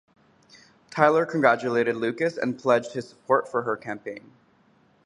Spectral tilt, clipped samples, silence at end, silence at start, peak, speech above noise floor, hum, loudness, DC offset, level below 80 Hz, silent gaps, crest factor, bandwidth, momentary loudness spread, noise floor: -6 dB/octave; under 0.1%; 0.85 s; 0.9 s; -2 dBFS; 37 dB; none; -24 LUFS; under 0.1%; -70 dBFS; none; 24 dB; 10.5 kHz; 15 LU; -61 dBFS